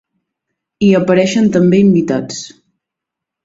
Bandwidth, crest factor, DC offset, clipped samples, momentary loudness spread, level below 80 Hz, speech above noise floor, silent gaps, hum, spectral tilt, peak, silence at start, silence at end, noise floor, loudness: 7.8 kHz; 14 dB; under 0.1%; under 0.1%; 15 LU; -50 dBFS; 70 dB; none; none; -6.5 dB/octave; 0 dBFS; 0.8 s; 0.95 s; -81 dBFS; -12 LUFS